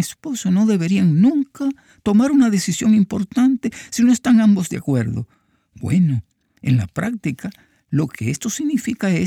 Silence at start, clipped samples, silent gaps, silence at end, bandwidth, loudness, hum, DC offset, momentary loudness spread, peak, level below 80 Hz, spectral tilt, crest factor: 0 s; under 0.1%; none; 0 s; 15.5 kHz; -18 LUFS; none; under 0.1%; 12 LU; -6 dBFS; -52 dBFS; -6 dB/octave; 12 dB